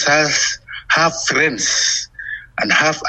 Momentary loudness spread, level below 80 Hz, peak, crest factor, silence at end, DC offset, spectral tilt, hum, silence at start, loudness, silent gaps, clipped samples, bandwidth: 13 LU; -50 dBFS; -2 dBFS; 14 dB; 0 s; under 0.1%; -1.5 dB/octave; none; 0 s; -15 LUFS; none; under 0.1%; 10.5 kHz